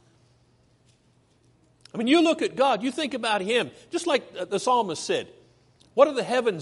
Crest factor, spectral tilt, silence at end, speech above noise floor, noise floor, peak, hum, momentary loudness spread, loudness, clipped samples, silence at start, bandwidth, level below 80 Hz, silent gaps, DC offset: 22 dB; -4 dB/octave; 0 s; 39 dB; -63 dBFS; -4 dBFS; none; 10 LU; -24 LUFS; under 0.1%; 1.95 s; 11.5 kHz; -72 dBFS; none; under 0.1%